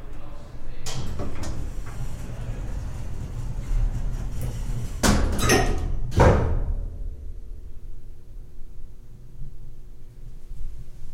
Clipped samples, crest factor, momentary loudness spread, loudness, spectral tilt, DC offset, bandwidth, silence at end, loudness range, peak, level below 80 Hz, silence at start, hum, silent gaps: under 0.1%; 22 dB; 26 LU; -27 LUFS; -5 dB/octave; under 0.1%; 16 kHz; 0 s; 21 LU; -4 dBFS; -30 dBFS; 0 s; none; none